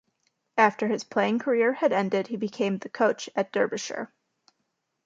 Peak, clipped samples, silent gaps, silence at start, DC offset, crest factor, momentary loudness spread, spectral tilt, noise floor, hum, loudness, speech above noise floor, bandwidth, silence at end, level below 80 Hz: -6 dBFS; under 0.1%; none; 0.55 s; under 0.1%; 20 dB; 9 LU; -5 dB/octave; -78 dBFS; none; -26 LUFS; 53 dB; 7.8 kHz; 1 s; -76 dBFS